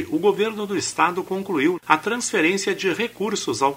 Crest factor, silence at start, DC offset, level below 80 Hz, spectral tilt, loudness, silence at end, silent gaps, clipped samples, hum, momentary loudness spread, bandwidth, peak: 22 dB; 0 s; under 0.1%; -64 dBFS; -3.5 dB/octave; -22 LUFS; 0 s; none; under 0.1%; none; 5 LU; 16 kHz; 0 dBFS